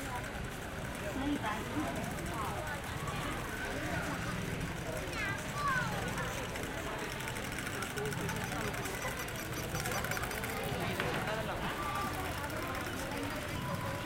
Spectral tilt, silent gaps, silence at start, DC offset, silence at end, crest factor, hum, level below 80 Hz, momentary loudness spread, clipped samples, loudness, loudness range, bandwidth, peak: -4 dB/octave; none; 0 s; under 0.1%; 0 s; 22 dB; none; -50 dBFS; 4 LU; under 0.1%; -37 LUFS; 2 LU; 17 kHz; -16 dBFS